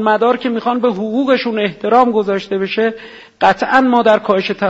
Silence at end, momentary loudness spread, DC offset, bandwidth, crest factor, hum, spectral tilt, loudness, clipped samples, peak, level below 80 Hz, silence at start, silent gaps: 0 s; 7 LU; under 0.1%; 8 kHz; 14 dB; none; -6 dB/octave; -14 LUFS; under 0.1%; 0 dBFS; -54 dBFS; 0 s; none